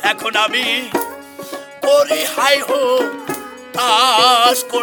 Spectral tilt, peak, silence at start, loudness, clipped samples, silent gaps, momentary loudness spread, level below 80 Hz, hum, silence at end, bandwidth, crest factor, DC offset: -1 dB/octave; 0 dBFS; 0 s; -14 LUFS; under 0.1%; none; 17 LU; -66 dBFS; none; 0 s; over 20 kHz; 16 dB; under 0.1%